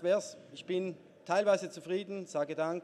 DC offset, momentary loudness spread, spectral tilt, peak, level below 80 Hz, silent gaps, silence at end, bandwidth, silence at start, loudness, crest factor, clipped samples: under 0.1%; 15 LU; -5 dB/octave; -16 dBFS; -86 dBFS; none; 0 s; 12 kHz; 0 s; -34 LUFS; 18 dB; under 0.1%